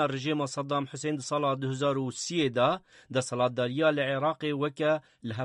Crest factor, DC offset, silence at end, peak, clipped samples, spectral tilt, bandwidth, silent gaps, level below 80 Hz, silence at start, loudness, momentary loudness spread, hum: 16 dB; under 0.1%; 0 s; -14 dBFS; under 0.1%; -5 dB/octave; 11.5 kHz; none; -70 dBFS; 0 s; -29 LUFS; 6 LU; none